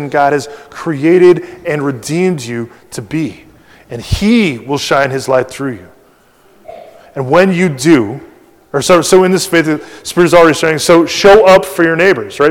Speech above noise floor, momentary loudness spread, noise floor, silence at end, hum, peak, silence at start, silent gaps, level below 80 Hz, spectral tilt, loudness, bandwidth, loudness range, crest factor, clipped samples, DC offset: 37 dB; 16 LU; -47 dBFS; 0 s; none; 0 dBFS; 0 s; none; -36 dBFS; -5 dB/octave; -10 LUFS; 16.5 kHz; 7 LU; 12 dB; 2%; under 0.1%